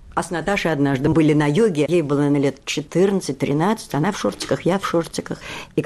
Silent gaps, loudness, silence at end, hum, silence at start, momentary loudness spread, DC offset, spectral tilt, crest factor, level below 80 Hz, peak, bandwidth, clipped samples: none; -20 LUFS; 0 s; none; 0 s; 9 LU; under 0.1%; -6 dB/octave; 12 dB; -48 dBFS; -8 dBFS; 13.5 kHz; under 0.1%